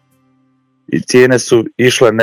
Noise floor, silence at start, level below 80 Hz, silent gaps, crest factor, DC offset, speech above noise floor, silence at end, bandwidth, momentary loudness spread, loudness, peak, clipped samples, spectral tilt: -57 dBFS; 0.9 s; -54 dBFS; none; 12 dB; under 0.1%; 47 dB; 0 s; 15 kHz; 10 LU; -11 LUFS; 0 dBFS; 0.6%; -4.5 dB/octave